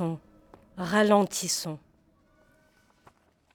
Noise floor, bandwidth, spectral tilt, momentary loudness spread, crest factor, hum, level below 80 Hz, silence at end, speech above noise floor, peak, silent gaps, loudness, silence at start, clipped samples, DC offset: -64 dBFS; 20 kHz; -4 dB/octave; 21 LU; 22 dB; none; -66 dBFS; 1.75 s; 39 dB; -8 dBFS; none; -26 LUFS; 0 s; under 0.1%; under 0.1%